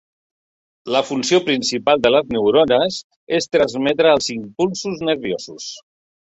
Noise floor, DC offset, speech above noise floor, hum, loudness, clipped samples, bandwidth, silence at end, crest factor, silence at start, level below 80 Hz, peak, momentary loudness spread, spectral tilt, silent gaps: under -90 dBFS; under 0.1%; over 72 dB; none; -18 LUFS; under 0.1%; 8.2 kHz; 0.5 s; 18 dB; 0.85 s; -56 dBFS; -2 dBFS; 15 LU; -4 dB/octave; 3.04-3.10 s, 3.16-3.27 s